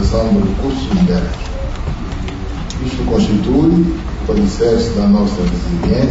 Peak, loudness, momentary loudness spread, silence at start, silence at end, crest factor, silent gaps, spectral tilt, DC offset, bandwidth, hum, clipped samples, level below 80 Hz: -2 dBFS; -16 LUFS; 11 LU; 0 s; 0 s; 12 dB; none; -7.5 dB/octave; under 0.1%; 8 kHz; none; under 0.1%; -22 dBFS